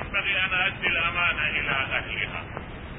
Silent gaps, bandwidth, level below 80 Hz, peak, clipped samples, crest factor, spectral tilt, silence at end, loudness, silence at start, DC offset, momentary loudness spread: none; 4 kHz; -44 dBFS; -10 dBFS; under 0.1%; 18 dB; -8 dB/octave; 0 s; -24 LUFS; 0 s; under 0.1%; 10 LU